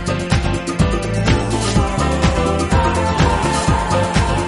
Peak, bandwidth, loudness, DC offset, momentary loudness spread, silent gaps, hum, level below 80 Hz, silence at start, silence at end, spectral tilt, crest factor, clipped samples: -2 dBFS; 11.5 kHz; -17 LUFS; under 0.1%; 2 LU; none; none; -24 dBFS; 0 s; 0 s; -5.5 dB/octave; 14 dB; under 0.1%